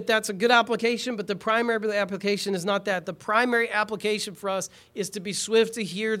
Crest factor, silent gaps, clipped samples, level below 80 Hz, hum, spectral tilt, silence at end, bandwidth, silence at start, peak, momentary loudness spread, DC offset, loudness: 20 dB; none; under 0.1%; -70 dBFS; none; -3.5 dB/octave; 0 s; 16 kHz; 0 s; -4 dBFS; 9 LU; under 0.1%; -25 LUFS